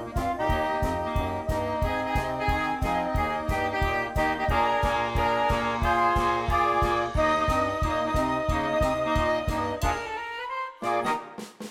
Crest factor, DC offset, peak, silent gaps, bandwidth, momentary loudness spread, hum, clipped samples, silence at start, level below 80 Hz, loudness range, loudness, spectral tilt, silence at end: 14 dB; under 0.1%; -12 dBFS; none; 17.5 kHz; 6 LU; none; under 0.1%; 0 s; -36 dBFS; 3 LU; -26 LUFS; -5.5 dB/octave; 0 s